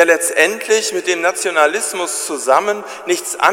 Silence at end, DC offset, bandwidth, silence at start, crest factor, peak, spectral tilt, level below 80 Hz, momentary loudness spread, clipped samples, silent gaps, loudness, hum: 0 s; under 0.1%; 16.5 kHz; 0 s; 16 dB; 0 dBFS; -0.5 dB/octave; -68 dBFS; 7 LU; under 0.1%; none; -16 LUFS; none